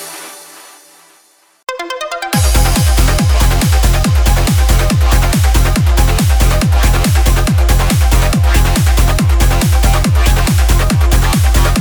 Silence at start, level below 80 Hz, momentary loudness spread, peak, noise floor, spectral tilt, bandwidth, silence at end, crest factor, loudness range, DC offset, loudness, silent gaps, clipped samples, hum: 0 s; -12 dBFS; 6 LU; 0 dBFS; -49 dBFS; -4.5 dB/octave; over 20 kHz; 0 s; 10 dB; 2 LU; under 0.1%; -12 LUFS; none; under 0.1%; none